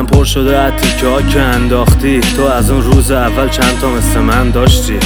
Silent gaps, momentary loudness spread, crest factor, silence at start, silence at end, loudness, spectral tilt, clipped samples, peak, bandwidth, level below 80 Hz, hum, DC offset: none; 2 LU; 10 dB; 0 s; 0 s; -11 LUFS; -5 dB/octave; under 0.1%; 0 dBFS; over 20 kHz; -14 dBFS; none; under 0.1%